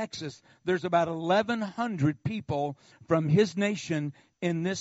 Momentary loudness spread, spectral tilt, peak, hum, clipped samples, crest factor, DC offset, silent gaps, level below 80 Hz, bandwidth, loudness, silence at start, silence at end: 12 LU; -5.5 dB/octave; -10 dBFS; none; under 0.1%; 18 dB; under 0.1%; none; -64 dBFS; 8 kHz; -29 LUFS; 0 s; 0 s